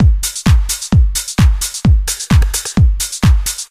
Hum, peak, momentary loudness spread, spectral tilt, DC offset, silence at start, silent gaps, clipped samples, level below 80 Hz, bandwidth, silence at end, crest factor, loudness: none; 0 dBFS; 2 LU; -4.5 dB/octave; under 0.1%; 0 s; none; under 0.1%; -14 dBFS; 16 kHz; 0.05 s; 12 dB; -14 LUFS